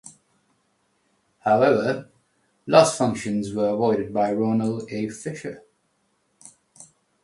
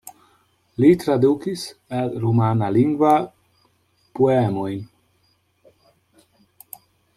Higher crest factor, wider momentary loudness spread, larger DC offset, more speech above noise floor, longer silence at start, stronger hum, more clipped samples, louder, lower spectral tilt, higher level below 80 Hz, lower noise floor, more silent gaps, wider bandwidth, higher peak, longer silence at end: about the same, 24 dB vs 20 dB; second, 15 LU vs 22 LU; neither; about the same, 48 dB vs 46 dB; second, 0.05 s vs 0.8 s; neither; neither; about the same, -22 LUFS vs -20 LUFS; second, -5.5 dB/octave vs -8 dB/octave; about the same, -62 dBFS vs -60 dBFS; first, -69 dBFS vs -64 dBFS; neither; second, 11.5 kHz vs 14.5 kHz; about the same, -2 dBFS vs -2 dBFS; second, 0.4 s vs 2.3 s